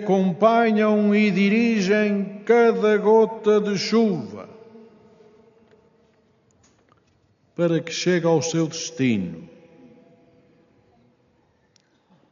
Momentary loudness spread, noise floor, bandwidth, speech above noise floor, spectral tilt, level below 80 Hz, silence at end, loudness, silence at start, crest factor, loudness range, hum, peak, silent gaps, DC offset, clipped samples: 9 LU; -63 dBFS; 7.2 kHz; 43 dB; -5 dB/octave; -70 dBFS; 2.85 s; -20 LUFS; 0 s; 18 dB; 13 LU; none; -4 dBFS; none; under 0.1%; under 0.1%